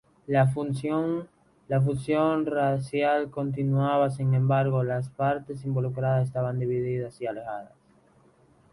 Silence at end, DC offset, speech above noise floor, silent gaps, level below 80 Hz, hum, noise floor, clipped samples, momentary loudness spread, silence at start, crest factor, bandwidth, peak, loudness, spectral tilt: 1.05 s; under 0.1%; 34 dB; none; -60 dBFS; none; -60 dBFS; under 0.1%; 8 LU; 0.3 s; 18 dB; 11.5 kHz; -8 dBFS; -27 LUFS; -8.5 dB/octave